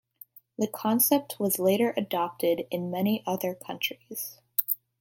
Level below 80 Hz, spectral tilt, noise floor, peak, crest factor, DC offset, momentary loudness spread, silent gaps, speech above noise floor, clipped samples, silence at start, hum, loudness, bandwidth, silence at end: -76 dBFS; -4 dB/octave; -54 dBFS; -6 dBFS; 22 dB; under 0.1%; 10 LU; none; 26 dB; under 0.1%; 0.6 s; none; -28 LUFS; 17 kHz; 0.25 s